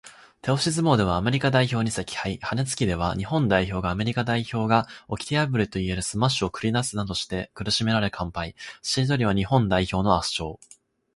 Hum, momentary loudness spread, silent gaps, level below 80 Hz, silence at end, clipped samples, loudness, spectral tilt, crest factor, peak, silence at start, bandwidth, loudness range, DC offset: none; 9 LU; none; -44 dBFS; 0.6 s; under 0.1%; -24 LUFS; -5 dB/octave; 20 dB; -4 dBFS; 0.05 s; 11.5 kHz; 2 LU; under 0.1%